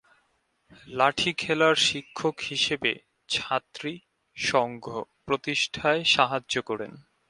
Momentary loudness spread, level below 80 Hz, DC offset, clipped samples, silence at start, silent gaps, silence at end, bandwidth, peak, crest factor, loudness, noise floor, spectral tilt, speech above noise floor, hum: 15 LU; -62 dBFS; under 0.1%; under 0.1%; 0.85 s; none; 0.3 s; 11.5 kHz; -4 dBFS; 22 dB; -25 LUFS; -71 dBFS; -3 dB/octave; 44 dB; none